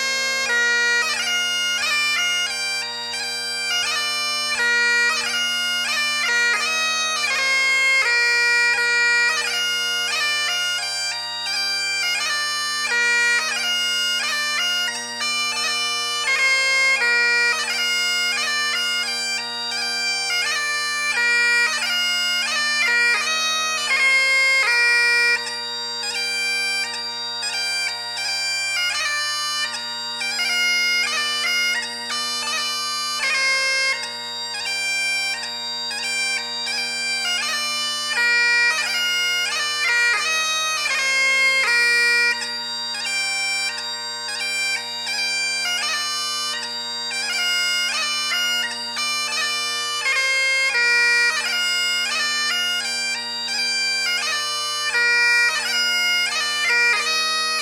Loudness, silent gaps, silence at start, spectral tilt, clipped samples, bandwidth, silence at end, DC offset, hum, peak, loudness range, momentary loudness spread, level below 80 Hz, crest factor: -19 LUFS; none; 0 s; 2 dB/octave; under 0.1%; 19 kHz; 0 s; under 0.1%; none; -6 dBFS; 5 LU; 8 LU; -74 dBFS; 14 dB